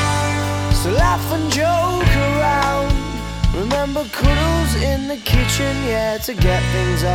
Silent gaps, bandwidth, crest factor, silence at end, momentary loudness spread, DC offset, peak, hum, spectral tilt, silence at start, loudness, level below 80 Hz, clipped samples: none; 18 kHz; 16 dB; 0 s; 5 LU; under 0.1%; 0 dBFS; none; -5 dB/octave; 0 s; -18 LUFS; -22 dBFS; under 0.1%